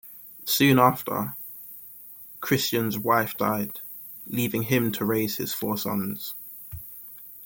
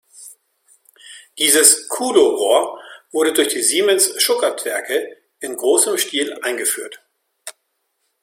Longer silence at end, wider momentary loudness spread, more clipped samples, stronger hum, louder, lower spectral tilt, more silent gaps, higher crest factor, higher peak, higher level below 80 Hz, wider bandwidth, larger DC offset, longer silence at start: second, 0 s vs 0.7 s; second, 19 LU vs 22 LU; neither; neither; second, -25 LUFS vs -16 LUFS; first, -5 dB/octave vs 0 dB/octave; neither; about the same, 22 dB vs 18 dB; second, -4 dBFS vs 0 dBFS; first, -62 dBFS vs -68 dBFS; about the same, 17 kHz vs 16.5 kHz; neither; second, 0.05 s vs 0.2 s